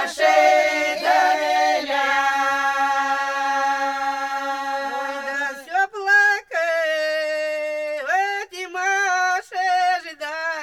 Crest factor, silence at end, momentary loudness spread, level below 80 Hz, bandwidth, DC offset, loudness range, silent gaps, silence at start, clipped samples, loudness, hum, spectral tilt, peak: 16 dB; 0 s; 10 LU; -66 dBFS; 15.5 kHz; under 0.1%; 3 LU; none; 0 s; under 0.1%; -20 LUFS; none; 0 dB/octave; -4 dBFS